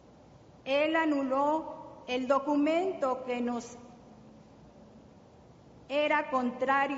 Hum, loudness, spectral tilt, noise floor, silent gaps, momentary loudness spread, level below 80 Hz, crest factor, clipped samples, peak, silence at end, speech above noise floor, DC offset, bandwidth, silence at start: none; -30 LUFS; -2 dB/octave; -56 dBFS; none; 14 LU; -68 dBFS; 18 dB; under 0.1%; -14 dBFS; 0 s; 27 dB; under 0.1%; 7.6 kHz; 0.35 s